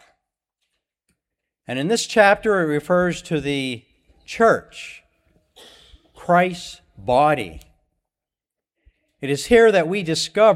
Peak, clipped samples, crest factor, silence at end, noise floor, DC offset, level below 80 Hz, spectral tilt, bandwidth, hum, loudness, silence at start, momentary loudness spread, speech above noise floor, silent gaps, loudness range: -2 dBFS; under 0.1%; 20 dB; 0 s; -88 dBFS; under 0.1%; -50 dBFS; -4.5 dB/octave; 14 kHz; none; -19 LUFS; 1.7 s; 20 LU; 70 dB; none; 4 LU